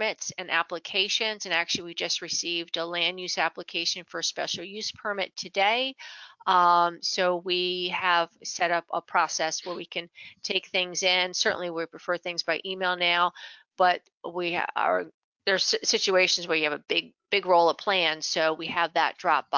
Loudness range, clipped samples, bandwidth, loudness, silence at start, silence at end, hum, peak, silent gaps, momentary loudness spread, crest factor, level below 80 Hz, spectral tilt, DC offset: 4 LU; under 0.1%; 7.6 kHz; -26 LUFS; 0 s; 0 s; none; -8 dBFS; 14.14-14.21 s, 15.14-15.32 s; 10 LU; 18 dB; -76 dBFS; -1.5 dB/octave; under 0.1%